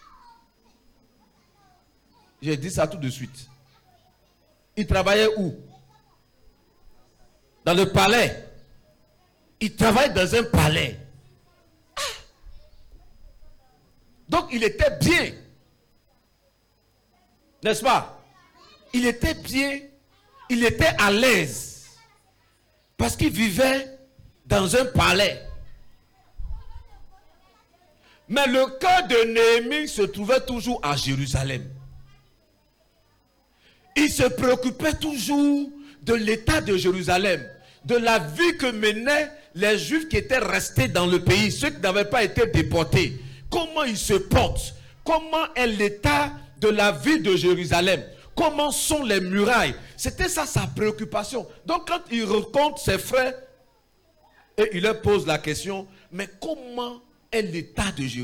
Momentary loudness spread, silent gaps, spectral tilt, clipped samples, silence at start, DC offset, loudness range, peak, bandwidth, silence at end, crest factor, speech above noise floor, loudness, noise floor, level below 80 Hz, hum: 14 LU; none; -4.5 dB/octave; under 0.1%; 2.4 s; under 0.1%; 7 LU; -4 dBFS; 18 kHz; 0 s; 20 dB; 42 dB; -22 LUFS; -64 dBFS; -42 dBFS; none